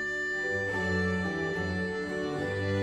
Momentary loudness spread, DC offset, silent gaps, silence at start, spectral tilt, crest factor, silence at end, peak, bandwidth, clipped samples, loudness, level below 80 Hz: 4 LU; under 0.1%; none; 0 s; -6 dB/octave; 14 dB; 0 s; -18 dBFS; 11 kHz; under 0.1%; -31 LUFS; -54 dBFS